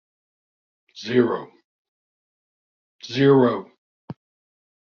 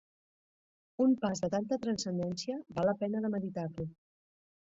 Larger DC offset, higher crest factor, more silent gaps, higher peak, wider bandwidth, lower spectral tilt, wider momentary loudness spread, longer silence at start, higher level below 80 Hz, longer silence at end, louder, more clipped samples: neither; about the same, 20 dB vs 16 dB; first, 1.64-2.99 s, 3.78-4.08 s vs none; first, -4 dBFS vs -18 dBFS; second, 6.8 kHz vs 8 kHz; about the same, -5.5 dB/octave vs -6 dB/octave; first, 26 LU vs 10 LU; about the same, 0.95 s vs 1 s; about the same, -68 dBFS vs -68 dBFS; about the same, 0.7 s vs 0.75 s; first, -20 LUFS vs -34 LUFS; neither